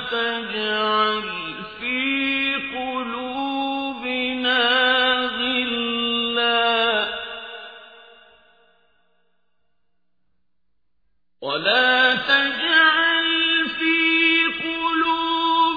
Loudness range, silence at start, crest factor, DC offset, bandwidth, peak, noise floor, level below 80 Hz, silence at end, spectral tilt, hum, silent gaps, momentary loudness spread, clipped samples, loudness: 8 LU; 0 s; 18 dB; under 0.1%; 5 kHz; -6 dBFS; -78 dBFS; -60 dBFS; 0 s; -4.5 dB/octave; none; none; 12 LU; under 0.1%; -19 LUFS